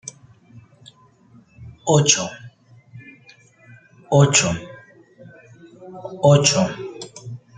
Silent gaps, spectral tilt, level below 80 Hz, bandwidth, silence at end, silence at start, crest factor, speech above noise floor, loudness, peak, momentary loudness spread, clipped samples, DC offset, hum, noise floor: none; -4 dB/octave; -56 dBFS; 9.4 kHz; 0.2 s; 0.05 s; 22 dB; 36 dB; -17 LUFS; 0 dBFS; 23 LU; under 0.1%; under 0.1%; none; -52 dBFS